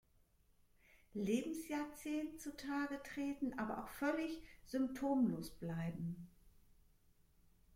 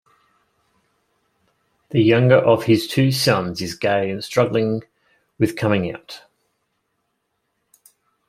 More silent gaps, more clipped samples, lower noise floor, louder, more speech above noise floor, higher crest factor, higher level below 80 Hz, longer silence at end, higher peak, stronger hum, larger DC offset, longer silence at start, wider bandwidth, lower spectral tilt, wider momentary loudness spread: neither; neither; about the same, -73 dBFS vs -73 dBFS; second, -42 LUFS vs -19 LUFS; second, 32 dB vs 55 dB; about the same, 18 dB vs 20 dB; second, -68 dBFS vs -58 dBFS; second, 1.25 s vs 2.1 s; second, -26 dBFS vs -2 dBFS; neither; neither; second, 0.95 s vs 1.9 s; about the same, 16.5 kHz vs 16 kHz; about the same, -6 dB/octave vs -6 dB/octave; second, 10 LU vs 14 LU